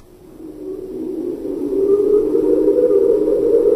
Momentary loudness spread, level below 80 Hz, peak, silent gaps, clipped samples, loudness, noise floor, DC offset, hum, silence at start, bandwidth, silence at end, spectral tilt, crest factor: 16 LU; -44 dBFS; -4 dBFS; none; under 0.1%; -16 LUFS; -37 dBFS; under 0.1%; none; 0.35 s; 12 kHz; 0 s; -8.5 dB/octave; 12 dB